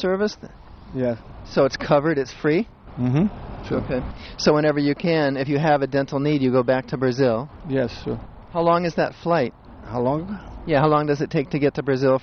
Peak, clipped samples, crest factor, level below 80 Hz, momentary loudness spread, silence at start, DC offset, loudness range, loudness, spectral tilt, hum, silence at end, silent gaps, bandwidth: -4 dBFS; under 0.1%; 18 dB; -44 dBFS; 11 LU; 0 s; under 0.1%; 3 LU; -22 LUFS; -7 dB/octave; none; 0 s; none; 6.6 kHz